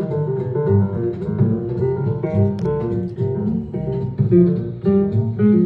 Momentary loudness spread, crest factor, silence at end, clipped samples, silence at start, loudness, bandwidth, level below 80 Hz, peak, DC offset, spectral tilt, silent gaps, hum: 7 LU; 16 dB; 0 s; under 0.1%; 0 s; -19 LUFS; 4.5 kHz; -44 dBFS; -4 dBFS; under 0.1%; -12 dB/octave; none; none